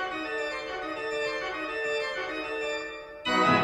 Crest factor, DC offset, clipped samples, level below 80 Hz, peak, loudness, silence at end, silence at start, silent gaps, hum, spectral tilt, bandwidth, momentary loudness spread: 20 dB; under 0.1%; under 0.1%; -60 dBFS; -10 dBFS; -30 LUFS; 0 s; 0 s; none; none; -4 dB/octave; 14 kHz; 7 LU